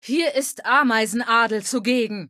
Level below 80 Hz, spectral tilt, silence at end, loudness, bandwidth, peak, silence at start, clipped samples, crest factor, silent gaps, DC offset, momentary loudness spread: -76 dBFS; -2.5 dB/octave; 0.05 s; -20 LUFS; 14.5 kHz; -6 dBFS; 0.05 s; under 0.1%; 16 dB; none; under 0.1%; 5 LU